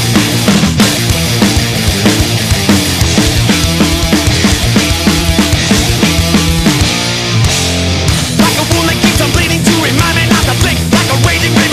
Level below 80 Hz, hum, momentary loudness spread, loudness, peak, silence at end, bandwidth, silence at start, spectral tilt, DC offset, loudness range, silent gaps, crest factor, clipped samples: -20 dBFS; none; 2 LU; -9 LUFS; 0 dBFS; 0 s; 15.5 kHz; 0 s; -4 dB/octave; under 0.1%; 1 LU; none; 10 dB; under 0.1%